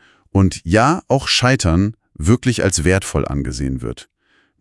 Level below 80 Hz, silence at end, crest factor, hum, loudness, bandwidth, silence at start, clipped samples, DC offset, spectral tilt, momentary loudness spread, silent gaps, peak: -34 dBFS; 0.6 s; 18 dB; none; -17 LUFS; 12 kHz; 0.35 s; under 0.1%; under 0.1%; -5 dB/octave; 9 LU; none; 0 dBFS